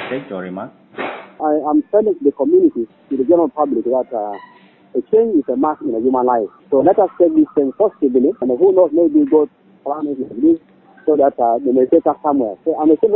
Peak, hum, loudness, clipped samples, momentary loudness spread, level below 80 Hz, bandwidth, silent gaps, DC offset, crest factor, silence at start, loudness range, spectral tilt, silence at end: 0 dBFS; none; -16 LUFS; under 0.1%; 13 LU; -60 dBFS; 4.1 kHz; none; under 0.1%; 14 dB; 0 s; 3 LU; -12 dB/octave; 0 s